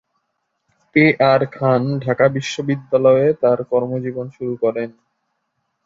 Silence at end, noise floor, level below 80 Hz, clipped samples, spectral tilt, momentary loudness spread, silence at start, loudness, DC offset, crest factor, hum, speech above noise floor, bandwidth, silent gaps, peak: 0.95 s; -72 dBFS; -60 dBFS; under 0.1%; -7 dB/octave; 12 LU; 0.95 s; -17 LUFS; under 0.1%; 16 dB; none; 56 dB; 7.6 kHz; none; -2 dBFS